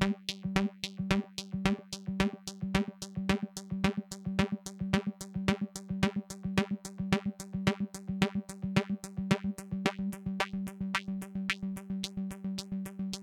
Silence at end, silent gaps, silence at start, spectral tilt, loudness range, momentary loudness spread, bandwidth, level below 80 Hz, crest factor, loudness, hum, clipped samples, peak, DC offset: 0 s; none; 0 s; -5.5 dB/octave; 1 LU; 6 LU; 15.5 kHz; -52 dBFS; 24 dB; -34 LUFS; none; under 0.1%; -10 dBFS; under 0.1%